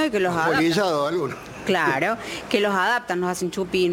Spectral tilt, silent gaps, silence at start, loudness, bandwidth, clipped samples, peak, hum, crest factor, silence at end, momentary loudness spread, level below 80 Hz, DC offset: -4.5 dB/octave; none; 0 s; -22 LUFS; 17 kHz; under 0.1%; -6 dBFS; none; 18 dB; 0 s; 7 LU; -56 dBFS; under 0.1%